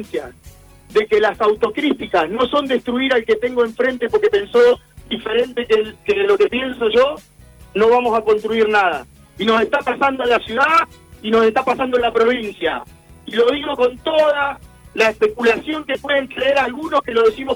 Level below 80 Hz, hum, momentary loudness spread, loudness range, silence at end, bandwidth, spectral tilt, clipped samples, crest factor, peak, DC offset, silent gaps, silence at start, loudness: -48 dBFS; none; 8 LU; 2 LU; 0 s; 19 kHz; -4.5 dB/octave; under 0.1%; 14 dB; -2 dBFS; under 0.1%; none; 0 s; -17 LUFS